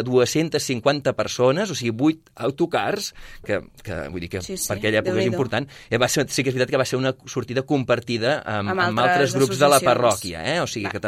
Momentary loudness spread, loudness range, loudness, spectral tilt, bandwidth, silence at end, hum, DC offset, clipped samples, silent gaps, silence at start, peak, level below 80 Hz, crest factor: 10 LU; 5 LU; -22 LUFS; -4.5 dB/octave; 16 kHz; 0 s; none; under 0.1%; under 0.1%; none; 0 s; -2 dBFS; -52 dBFS; 20 dB